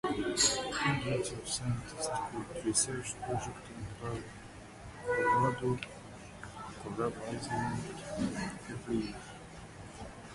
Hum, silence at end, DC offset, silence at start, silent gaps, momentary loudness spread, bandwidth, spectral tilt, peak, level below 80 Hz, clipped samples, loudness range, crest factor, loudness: none; 0 s; under 0.1%; 0.05 s; none; 19 LU; 11.5 kHz; -3.5 dB/octave; -14 dBFS; -56 dBFS; under 0.1%; 6 LU; 22 dB; -35 LUFS